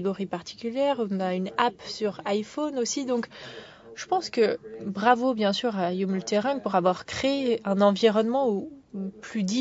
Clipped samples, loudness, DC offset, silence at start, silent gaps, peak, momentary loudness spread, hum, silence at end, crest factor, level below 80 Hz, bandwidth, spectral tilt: under 0.1%; -26 LUFS; under 0.1%; 0 s; none; -6 dBFS; 13 LU; none; 0 s; 20 dB; -64 dBFS; 8 kHz; -5 dB/octave